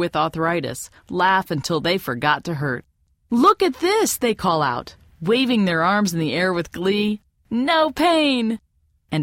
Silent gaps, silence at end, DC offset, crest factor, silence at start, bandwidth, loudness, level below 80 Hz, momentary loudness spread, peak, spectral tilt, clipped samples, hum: none; 0 s; under 0.1%; 18 dB; 0 s; 16.5 kHz; -20 LUFS; -52 dBFS; 11 LU; -4 dBFS; -4.5 dB/octave; under 0.1%; none